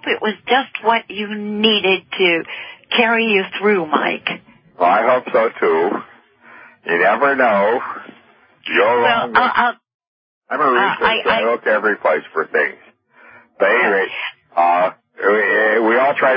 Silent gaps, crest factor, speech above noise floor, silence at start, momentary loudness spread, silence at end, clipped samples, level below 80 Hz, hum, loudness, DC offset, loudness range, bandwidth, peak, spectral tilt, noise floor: 9.94-9.99 s, 10.07-10.41 s; 18 dB; 34 dB; 0.05 s; 9 LU; 0 s; under 0.1%; -62 dBFS; none; -16 LUFS; under 0.1%; 2 LU; 5.2 kHz; 0 dBFS; -8 dB/octave; -50 dBFS